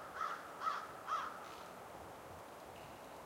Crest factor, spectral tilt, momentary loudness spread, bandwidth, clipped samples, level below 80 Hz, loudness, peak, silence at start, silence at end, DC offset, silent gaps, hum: 18 dB; -3 dB/octave; 11 LU; 16 kHz; under 0.1%; -74 dBFS; -46 LUFS; -28 dBFS; 0 s; 0 s; under 0.1%; none; none